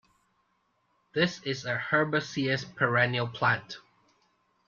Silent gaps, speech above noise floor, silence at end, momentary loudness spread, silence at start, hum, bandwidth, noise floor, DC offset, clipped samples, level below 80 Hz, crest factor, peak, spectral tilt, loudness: none; 45 dB; 0.9 s; 9 LU; 1.15 s; none; 7.4 kHz; -73 dBFS; under 0.1%; under 0.1%; -68 dBFS; 20 dB; -10 dBFS; -5.5 dB/octave; -28 LUFS